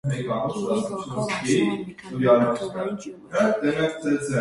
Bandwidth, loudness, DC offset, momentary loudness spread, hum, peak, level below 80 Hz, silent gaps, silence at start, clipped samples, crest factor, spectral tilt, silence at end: 11.5 kHz; -24 LUFS; under 0.1%; 10 LU; none; -4 dBFS; -58 dBFS; none; 0.05 s; under 0.1%; 18 dB; -6 dB/octave; 0 s